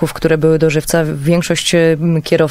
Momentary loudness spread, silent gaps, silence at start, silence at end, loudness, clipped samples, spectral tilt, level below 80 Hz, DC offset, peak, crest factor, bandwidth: 3 LU; none; 0 s; 0 s; -13 LUFS; under 0.1%; -5.5 dB/octave; -38 dBFS; under 0.1%; 0 dBFS; 12 dB; 16 kHz